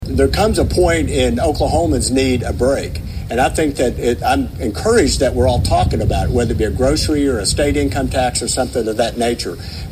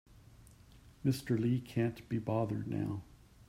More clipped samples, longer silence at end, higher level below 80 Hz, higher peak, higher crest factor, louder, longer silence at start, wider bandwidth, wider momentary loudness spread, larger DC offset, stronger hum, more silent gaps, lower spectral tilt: neither; about the same, 0 s vs 0.05 s; first, -26 dBFS vs -62 dBFS; first, 0 dBFS vs -20 dBFS; about the same, 14 dB vs 16 dB; first, -16 LUFS vs -36 LUFS; about the same, 0 s vs 0.1 s; about the same, 16 kHz vs 15.5 kHz; about the same, 5 LU vs 6 LU; neither; neither; neither; second, -5 dB/octave vs -7.5 dB/octave